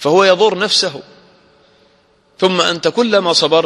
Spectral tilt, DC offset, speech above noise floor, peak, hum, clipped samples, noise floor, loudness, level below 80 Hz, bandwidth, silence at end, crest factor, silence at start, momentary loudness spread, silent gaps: -3.5 dB/octave; under 0.1%; 41 dB; 0 dBFS; none; under 0.1%; -54 dBFS; -13 LUFS; -60 dBFS; 12 kHz; 0 s; 14 dB; 0 s; 6 LU; none